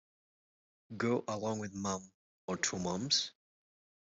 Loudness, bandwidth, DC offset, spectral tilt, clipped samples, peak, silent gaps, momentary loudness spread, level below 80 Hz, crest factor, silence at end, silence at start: -36 LUFS; 8.2 kHz; under 0.1%; -3.5 dB/octave; under 0.1%; -16 dBFS; 2.14-2.48 s; 11 LU; -74 dBFS; 22 dB; 0.8 s; 0.9 s